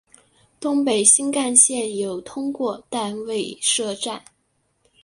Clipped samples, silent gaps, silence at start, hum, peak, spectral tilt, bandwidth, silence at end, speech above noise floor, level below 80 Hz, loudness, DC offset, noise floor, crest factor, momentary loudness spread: under 0.1%; none; 0.6 s; none; 0 dBFS; -1.5 dB/octave; 11.5 kHz; 0.85 s; 47 dB; -68 dBFS; -19 LUFS; under 0.1%; -68 dBFS; 22 dB; 15 LU